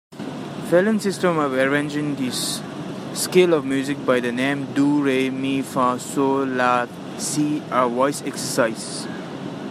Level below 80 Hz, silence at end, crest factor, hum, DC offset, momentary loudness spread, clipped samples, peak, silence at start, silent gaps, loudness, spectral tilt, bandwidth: -68 dBFS; 0 s; 18 dB; none; under 0.1%; 12 LU; under 0.1%; -4 dBFS; 0.1 s; none; -21 LUFS; -4.5 dB/octave; 15 kHz